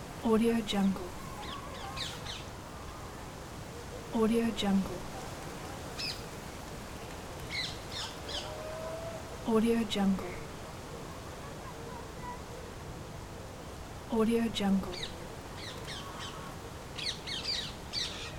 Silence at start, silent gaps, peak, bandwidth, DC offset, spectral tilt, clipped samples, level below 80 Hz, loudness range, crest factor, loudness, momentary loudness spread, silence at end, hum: 0 s; none; -16 dBFS; 17.5 kHz; under 0.1%; -5 dB/octave; under 0.1%; -50 dBFS; 6 LU; 20 dB; -36 LUFS; 15 LU; 0 s; none